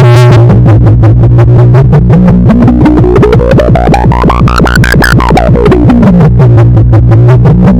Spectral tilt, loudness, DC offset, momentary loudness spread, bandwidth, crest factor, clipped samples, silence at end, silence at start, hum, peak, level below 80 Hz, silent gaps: -8 dB/octave; -4 LUFS; 4%; 2 LU; 12.5 kHz; 2 dB; 20%; 0 s; 0 s; none; 0 dBFS; -12 dBFS; none